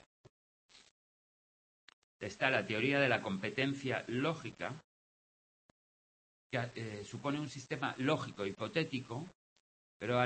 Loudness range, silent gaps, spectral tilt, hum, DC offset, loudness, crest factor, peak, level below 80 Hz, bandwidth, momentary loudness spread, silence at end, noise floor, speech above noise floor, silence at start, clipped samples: 8 LU; 4.84-6.50 s, 9.35-10.00 s; -5.5 dB/octave; none; under 0.1%; -37 LUFS; 24 dB; -14 dBFS; -76 dBFS; 8.4 kHz; 13 LU; 0 s; under -90 dBFS; over 53 dB; 2.2 s; under 0.1%